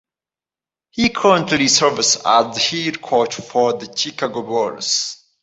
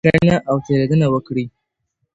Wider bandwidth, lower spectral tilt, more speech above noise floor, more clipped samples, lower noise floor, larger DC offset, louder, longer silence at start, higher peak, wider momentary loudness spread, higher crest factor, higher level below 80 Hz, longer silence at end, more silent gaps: about the same, 8.2 kHz vs 8 kHz; second, -2.5 dB/octave vs -8 dB/octave; first, over 72 dB vs 56 dB; neither; first, under -90 dBFS vs -72 dBFS; neither; about the same, -17 LUFS vs -17 LUFS; first, 0.95 s vs 0.05 s; about the same, 0 dBFS vs 0 dBFS; about the same, 9 LU vs 10 LU; about the same, 18 dB vs 16 dB; second, -56 dBFS vs -44 dBFS; second, 0.3 s vs 0.65 s; neither